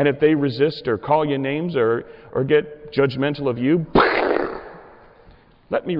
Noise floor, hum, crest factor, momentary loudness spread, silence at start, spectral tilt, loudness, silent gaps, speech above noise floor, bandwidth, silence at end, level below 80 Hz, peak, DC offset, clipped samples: -50 dBFS; none; 14 dB; 9 LU; 0 s; -9.5 dB/octave; -20 LUFS; none; 30 dB; 5.6 kHz; 0 s; -46 dBFS; -6 dBFS; under 0.1%; under 0.1%